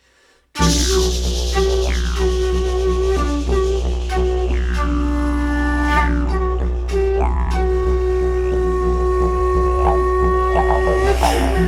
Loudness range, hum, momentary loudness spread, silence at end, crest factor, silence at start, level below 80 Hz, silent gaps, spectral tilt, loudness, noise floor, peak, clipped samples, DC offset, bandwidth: 2 LU; none; 4 LU; 0 s; 14 dB; 0.55 s; -20 dBFS; none; -5.5 dB/octave; -18 LUFS; -55 dBFS; -2 dBFS; under 0.1%; under 0.1%; 13 kHz